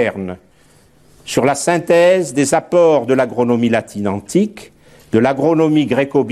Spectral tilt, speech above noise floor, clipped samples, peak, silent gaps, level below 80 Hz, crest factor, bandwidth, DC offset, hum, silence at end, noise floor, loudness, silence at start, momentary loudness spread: -5.5 dB/octave; 36 dB; under 0.1%; 0 dBFS; none; -54 dBFS; 14 dB; 14 kHz; 0.1%; none; 0 s; -50 dBFS; -15 LUFS; 0 s; 10 LU